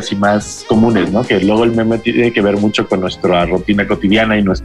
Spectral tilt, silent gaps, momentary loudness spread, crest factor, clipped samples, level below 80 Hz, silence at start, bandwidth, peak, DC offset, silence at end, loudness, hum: -6 dB/octave; none; 4 LU; 10 dB; under 0.1%; -34 dBFS; 0 s; 11.5 kHz; -2 dBFS; under 0.1%; 0 s; -13 LUFS; none